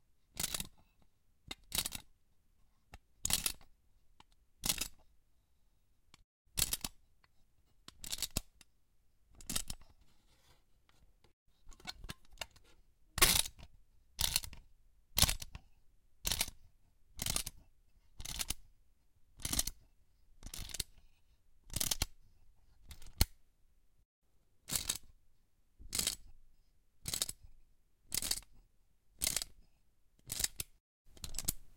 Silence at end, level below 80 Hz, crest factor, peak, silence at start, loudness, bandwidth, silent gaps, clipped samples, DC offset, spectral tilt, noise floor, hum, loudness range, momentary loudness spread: 0 s; -52 dBFS; 34 dB; -10 dBFS; 0.35 s; -37 LUFS; 17 kHz; 6.24-6.45 s, 11.33-11.46 s, 24.05-24.22 s, 30.80-31.05 s; under 0.1%; under 0.1%; -1 dB/octave; -73 dBFS; none; 9 LU; 17 LU